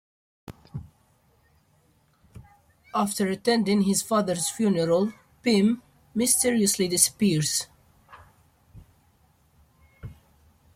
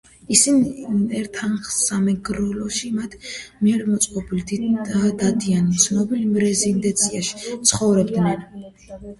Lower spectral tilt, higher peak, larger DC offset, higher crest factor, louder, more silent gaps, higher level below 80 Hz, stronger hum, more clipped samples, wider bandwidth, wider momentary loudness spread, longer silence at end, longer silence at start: about the same, -4 dB/octave vs -4 dB/octave; second, -4 dBFS vs 0 dBFS; neither; about the same, 24 dB vs 20 dB; second, -24 LUFS vs -20 LUFS; neither; second, -60 dBFS vs -48 dBFS; neither; neither; first, 16 kHz vs 12 kHz; first, 21 LU vs 10 LU; first, 0.65 s vs 0.05 s; first, 0.5 s vs 0.3 s